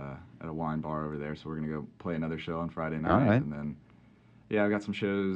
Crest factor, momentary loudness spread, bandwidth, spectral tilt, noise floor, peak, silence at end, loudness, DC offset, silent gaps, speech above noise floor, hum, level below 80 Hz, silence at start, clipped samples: 22 dB; 14 LU; 8.2 kHz; -8.5 dB/octave; -59 dBFS; -10 dBFS; 0 s; -32 LUFS; under 0.1%; none; 28 dB; none; -56 dBFS; 0 s; under 0.1%